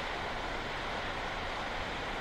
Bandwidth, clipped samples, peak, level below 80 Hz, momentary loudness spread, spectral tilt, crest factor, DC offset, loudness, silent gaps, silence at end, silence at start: 16 kHz; under 0.1%; -24 dBFS; -46 dBFS; 1 LU; -4 dB/octave; 12 dB; under 0.1%; -37 LUFS; none; 0 s; 0 s